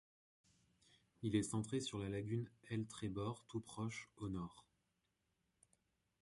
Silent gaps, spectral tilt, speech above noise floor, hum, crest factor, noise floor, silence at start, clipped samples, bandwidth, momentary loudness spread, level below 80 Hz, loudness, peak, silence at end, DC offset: none; -5.5 dB/octave; 42 dB; none; 22 dB; -86 dBFS; 1.2 s; under 0.1%; 11.5 kHz; 9 LU; -68 dBFS; -45 LUFS; -24 dBFS; 1.6 s; under 0.1%